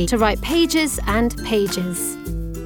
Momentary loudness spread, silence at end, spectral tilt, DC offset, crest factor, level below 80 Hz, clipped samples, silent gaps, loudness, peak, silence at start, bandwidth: 7 LU; 0 s; -4 dB/octave; under 0.1%; 16 dB; -30 dBFS; under 0.1%; none; -20 LUFS; -4 dBFS; 0 s; 19.5 kHz